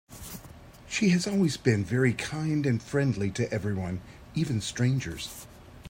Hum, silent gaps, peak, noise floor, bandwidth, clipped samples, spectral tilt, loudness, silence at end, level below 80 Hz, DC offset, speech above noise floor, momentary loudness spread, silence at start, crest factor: none; none; -8 dBFS; -48 dBFS; 16 kHz; under 0.1%; -6 dB/octave; -28 LUFS; 0 s; -54 dBFS; under 0.1%; 21 dB; 16 LU; 0.1 s; 20 dB